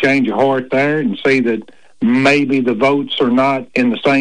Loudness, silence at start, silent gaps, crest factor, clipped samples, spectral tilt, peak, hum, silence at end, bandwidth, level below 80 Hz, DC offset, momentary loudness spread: -14 LUFS; 0 s; none; 10 dB; under 0.1%; -6 dB/octave; -4 dBFS; none; 0 s; 10 kHz; -56 dBFS; 0.7%; 4 LU